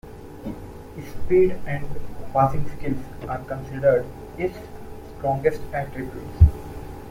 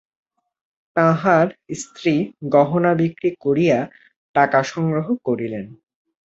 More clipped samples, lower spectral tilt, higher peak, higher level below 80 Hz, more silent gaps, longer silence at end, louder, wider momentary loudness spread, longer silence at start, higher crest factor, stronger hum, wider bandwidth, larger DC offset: neither; first, -9 dB/octave vs -7 dB/octave; about the same, -2 dBFS vs -2 dBFS; first, -32 dBFS vs -62 dBFS; second, none vs 4.16-4.34 s; second, 0 s vs 0.6 s; second, -24 LUFS vs -19 LUFS; first, 19 LU vs 12 LU; second, 0.05 s vs 0.95 s; about the same, 20 dB vs 18 dB; neither; first, 16 kHz vs 8 kHz; neither